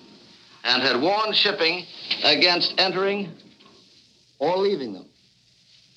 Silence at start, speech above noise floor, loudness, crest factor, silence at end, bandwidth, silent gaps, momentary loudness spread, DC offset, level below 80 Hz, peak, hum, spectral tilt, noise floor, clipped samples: 0.65 s; 38 dB; -21 LUFS; 20 dB; 0.95 s; 9.4 kHz; none; 13 LU; under 0.1%; -78 dBFS; -4 dBFS; none; -3.5 dB/octave; -59 dBFS; under 0.1%